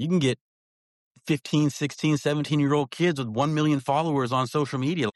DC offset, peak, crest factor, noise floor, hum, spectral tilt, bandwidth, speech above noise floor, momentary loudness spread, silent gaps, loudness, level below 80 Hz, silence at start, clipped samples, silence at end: under 0.1%; -12 dBFS; 14 dB; under -90 dBFS; none; -6 dB/octave; 12 kHz; over 66 dB; 4 LU; 0.41-1.15 s; -25 LUFS; -66 dBFS; 0 s; under 0.1%; 0.05 s